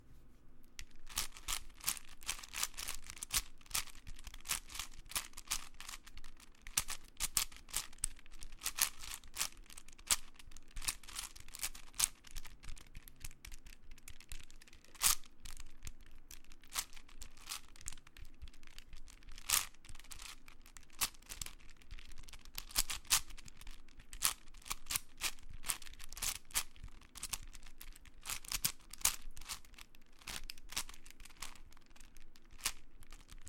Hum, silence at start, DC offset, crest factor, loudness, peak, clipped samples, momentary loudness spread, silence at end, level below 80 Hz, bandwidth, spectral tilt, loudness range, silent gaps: none; 0 s; under 0.1%; 36 dB; -40 LUFS; -6 dBFS; under 0.1%; 22 LU; 0 s; -52 dBFS; 17 kHz; 0.5 dB/octave; 5 LU; none